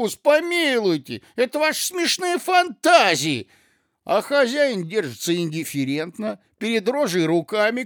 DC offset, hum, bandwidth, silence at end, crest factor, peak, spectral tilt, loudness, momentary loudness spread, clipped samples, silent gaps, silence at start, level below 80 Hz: under 0.1%; none; over 20 kHz; 0 s; 20 dB; -2 dBFS; -3.5 dB/octave; -21 LUFS; 10 LU; under 0.1%; none; 0 s; -76 dBFS